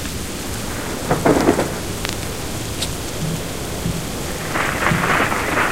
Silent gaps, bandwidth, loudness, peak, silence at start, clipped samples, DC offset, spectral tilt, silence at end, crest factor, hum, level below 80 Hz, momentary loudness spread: none; 16 kHz; -21 LUFS; 0 dBFS; 0 s; under 0.1%; 2%; -4 dB/octave; 0 s; 20 dB; none; -34 dBFS; 9 LU